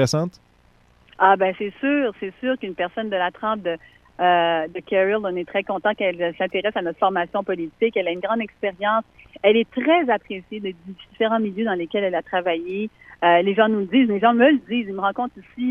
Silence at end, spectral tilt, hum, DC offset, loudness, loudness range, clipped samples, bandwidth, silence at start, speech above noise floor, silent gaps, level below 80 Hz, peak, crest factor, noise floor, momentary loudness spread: 0 s; -5.5 dB/octave; none; under 0.1%; -21 LUFS; 4 LU; under 0.1%; 12 kHz; 0 s; 35 dB; none; -60 dBFS; -2 dBFS; 20 dB; -56 dBFS; 11 LU